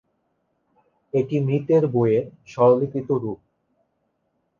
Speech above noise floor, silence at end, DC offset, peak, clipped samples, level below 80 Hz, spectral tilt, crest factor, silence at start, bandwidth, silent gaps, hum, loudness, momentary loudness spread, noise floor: 52 dB; 1.25 s; under 0.1%; -6 dBFS; under 0.1%; -64 dBFS; -9.5 dB/octave; 18 dB; 1.15 s; 7 kHz; none; none; -21 LUFS; 12 LU; -72 dBFS